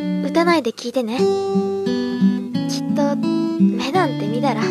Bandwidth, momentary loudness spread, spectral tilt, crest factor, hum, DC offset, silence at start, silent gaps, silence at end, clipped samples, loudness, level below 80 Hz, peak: 13.5 kHz; 5 LU; -6.5 dB/octave; 14 dB; none; under 0.1%; 0 s; none; 0 s; under 0.1%; -19 LUFS; -66 dBFS; -4 dBFS